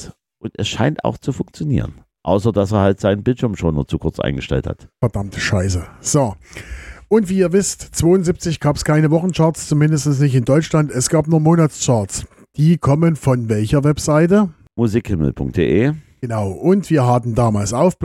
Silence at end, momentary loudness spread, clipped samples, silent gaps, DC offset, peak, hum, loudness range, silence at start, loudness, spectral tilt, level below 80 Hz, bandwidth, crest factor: 0 s; 10 LU; under 0.1%; none; under 0.1%; -2 dBFS; none; 4 LU; 0 s; -17 LUFS; -6 dB/octave; -38 dBFS; 13.5 kHz; 14 dB